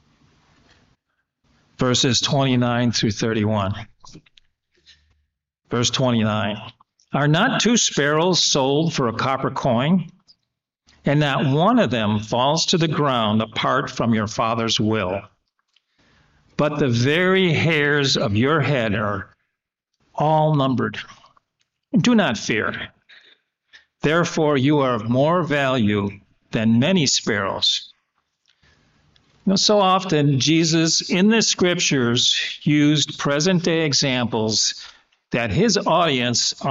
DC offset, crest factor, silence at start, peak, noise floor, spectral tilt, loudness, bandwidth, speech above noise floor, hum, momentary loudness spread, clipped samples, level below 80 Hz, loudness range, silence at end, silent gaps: under 0.1%; 14 dB; 1.8 s; -6 dBFS; -79 dBFS; -4 dB/octave; -19 LUFS; 8 kHz; 60 dB; none; 8 LU; under 0.1%; -54 dBFS; 6 LU; 0 s; none